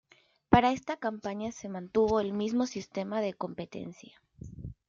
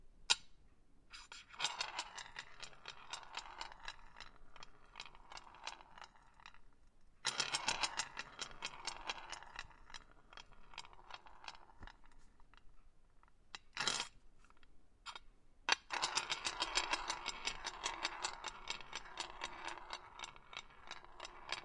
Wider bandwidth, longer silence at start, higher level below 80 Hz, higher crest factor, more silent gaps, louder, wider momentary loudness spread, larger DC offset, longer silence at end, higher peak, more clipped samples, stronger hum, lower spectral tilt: second, 7.6 kHz vs 11.5 kHz; first, 0.5 s vs 0 s; first, -54 dBFS vs -64 dBFS; second, 26 dB vs 34 dB; neither; first, -31 LUFS vs -43 LUFS; about the same, 20 LU vs 20 LU; neither; first, 0.15 s vs 0 s; first, -6 dBFS vs -12 dBFS; neither; neither; first, -6 dB/octave vs 0.5 dB/octave